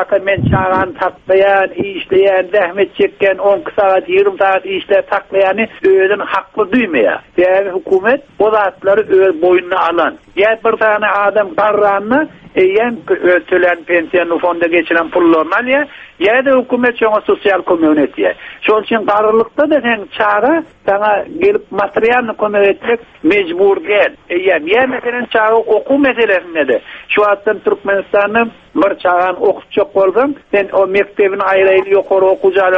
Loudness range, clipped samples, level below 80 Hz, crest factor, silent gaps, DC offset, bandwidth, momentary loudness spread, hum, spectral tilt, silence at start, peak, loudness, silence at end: 1 LU; under 0.1%; -46 dBFS; 12 dB; none; under 0.1%; 5.2 kHz; 5 LU; none; -7.5 dB/octave; 0 s; 0 dBFS; -12 LUFS; 0 s